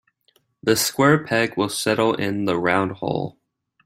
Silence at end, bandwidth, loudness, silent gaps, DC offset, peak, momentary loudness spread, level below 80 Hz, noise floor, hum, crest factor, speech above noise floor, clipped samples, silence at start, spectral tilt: 0.55 s; 16 kHz; -21 LUFS; none; under 0.1%; -2 dBFS; 9 LU; -60 dBFS; -64 dBFS; none; 18 dB; 44 dB; under 0.1%; 0.65 s; -4.5 dB/octave